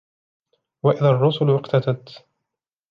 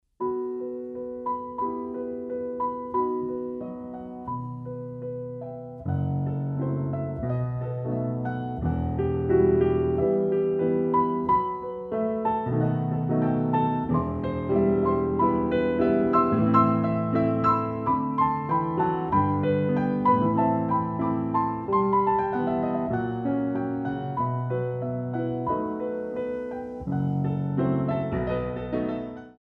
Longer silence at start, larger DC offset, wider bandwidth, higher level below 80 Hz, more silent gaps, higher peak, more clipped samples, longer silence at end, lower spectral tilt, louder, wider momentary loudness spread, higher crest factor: first, 0.85 s vs 0.2 s; neither; first, 6 kHz vs 4.5 kHz; second, -68 dBFS vs -48 dBFS; neither; first, -4 dBFS vs -8 dBFS; neither; first, 0.75 s vs 0.1 s; second, -9 dB/octave vs -11 dB/octave; first, -20 LUFS vs -26 LUFS; second, 8 LU vs 11 LU; about the same, 18 dB vs 18 dB